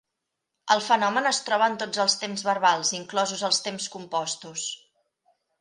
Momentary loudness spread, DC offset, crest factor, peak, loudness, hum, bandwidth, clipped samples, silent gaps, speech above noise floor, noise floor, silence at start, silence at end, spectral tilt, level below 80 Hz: 10 LU; under 0.1%; 22 dB; -6 dBFS; -25 LUFS; none; 11.5 kHz; under 0.1%; none; 58 dB; -83 dBFS; 0.65 s; 0.85 s; -1.5 dB/octave; -78 dBFS